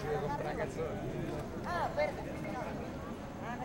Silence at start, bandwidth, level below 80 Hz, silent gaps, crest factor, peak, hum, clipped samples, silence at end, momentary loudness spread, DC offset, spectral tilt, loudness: 0 s; 16.5 kHz; -52 dBFS; none; 16 dB; -22 dBFS; none; under 0.1%; 0 s; 7 LU; under 0.1%; -6.5 dB/octave; -38 LUFS